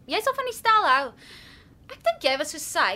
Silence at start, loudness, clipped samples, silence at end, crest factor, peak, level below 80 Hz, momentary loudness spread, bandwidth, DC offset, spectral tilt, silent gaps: 0.1 s; -23 LUFS; under 0.1%; 0 s; 18 dB; -6 dBFS; -60 dBFS; 9 LU; 16 kHz; under 0.1%; -1 dB/octave; none